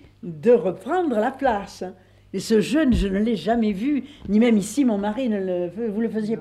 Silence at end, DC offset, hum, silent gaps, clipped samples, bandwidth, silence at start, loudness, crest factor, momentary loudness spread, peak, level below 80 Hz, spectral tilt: 0 s; under 0.1%; 50 Hz at -55 dBFS; none; under 0.1%; 13.5 kHz; 0.25 s; -22 LUFS; 14 dB; 10 LU; -8 dBFS; -40 dBFS; -6 dB/octave